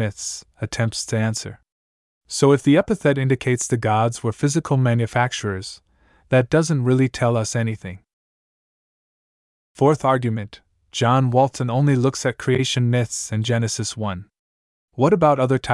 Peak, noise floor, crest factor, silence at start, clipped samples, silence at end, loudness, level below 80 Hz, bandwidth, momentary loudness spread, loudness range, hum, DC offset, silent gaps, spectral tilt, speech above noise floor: -4 dBFS; under -90 dBFS; 16 dB; 0 s; under 0.1%; 0 s; -20 LUFS; -54 dBFS; 12 kHz; 12 LU; 5 LU; none; under 0.1%; 1.72-2.21 s, 8.13-9.75 s, 14.39-14.88 s; -5.5 dB/octave; over 71 dB